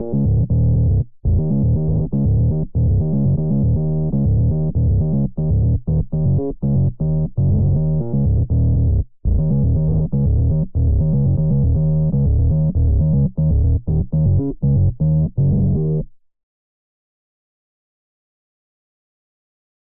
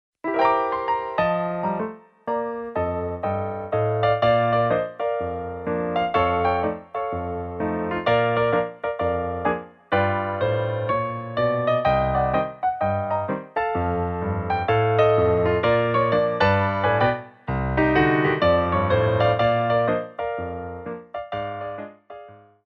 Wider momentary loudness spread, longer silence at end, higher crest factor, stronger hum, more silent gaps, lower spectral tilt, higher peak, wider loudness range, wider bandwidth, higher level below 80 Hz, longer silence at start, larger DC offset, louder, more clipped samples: second, 3 LU vs 11 LU; first, 3.55 s vs 0.3 s; second, 10 dB vs 16 dB; neither; neither; first, -18.5 dB/octave vs -9 dB/octave; about the same, -8 dBFS vs -6 dBFS; about the same, 3 LU vs 4 LU; second, 1.2 kHz vs 6.2 kHz; first, -26 dBFS vs -44 dBFS; second, 0 s vs 0.25 s; first, 3% vs under 0.1%; first, -18 LUFS vs -23 LUFS; neither